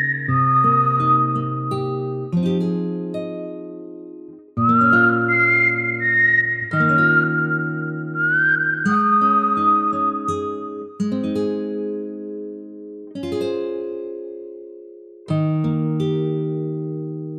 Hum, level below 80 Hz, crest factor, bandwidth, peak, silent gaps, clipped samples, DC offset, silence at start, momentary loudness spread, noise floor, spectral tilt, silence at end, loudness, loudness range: none; -64 dBFS; 16 dB; 9.8 kHz; -4 dBFS; none; under 0.1%; under 0.1%; 0 s; 18 LU; -41 dBFS; -8 dB/octave; 0 s; -19 LUFS; 10 LU